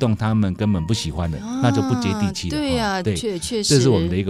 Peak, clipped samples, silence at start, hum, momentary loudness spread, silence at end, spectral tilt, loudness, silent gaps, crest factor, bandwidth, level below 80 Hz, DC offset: -2 dBFS; under 0.1%; 0 s; none; 8 LU; 0 s; -5.5 dB/octave; -20 LUFS; none; 18 dB; 14.5 kHz; -40 dBFS; under 0.1%